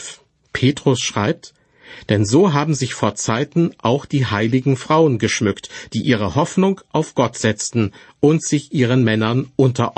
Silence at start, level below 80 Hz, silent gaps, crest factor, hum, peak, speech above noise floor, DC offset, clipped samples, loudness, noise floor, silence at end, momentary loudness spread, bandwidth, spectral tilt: 0 s; -52 dBFS; none; 16 dB; none; -2 dBFS; 22 dB; under 0.1%; under 0.1%; -18 LUFS; -39 dBFS; 0.05 s; 7 LU; 8.8 kHz; -5.5 dB/octave